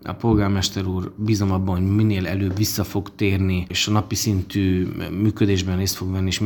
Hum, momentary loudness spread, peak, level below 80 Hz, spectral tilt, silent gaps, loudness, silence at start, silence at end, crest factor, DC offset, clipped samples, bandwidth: none; 5 LU; -4 dBFS; -44 dBFS; -5.5 dB/octave; none; -21 LUFS; 0 s; 0 s; 16 dB; under 0.1%; under 0.1%; 18 kHz